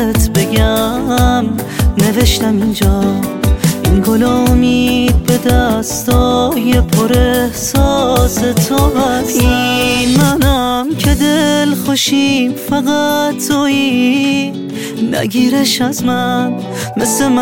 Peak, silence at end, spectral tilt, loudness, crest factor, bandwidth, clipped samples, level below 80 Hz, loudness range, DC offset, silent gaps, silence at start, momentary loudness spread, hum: 0 dBFS; 0 s; -5 dB/octave; -12 LUFS; 12 dB; 17 kHz; under 0.1%; -20 dBFS; 2 LU; 0.5%; none; 0 s; 4 LU; none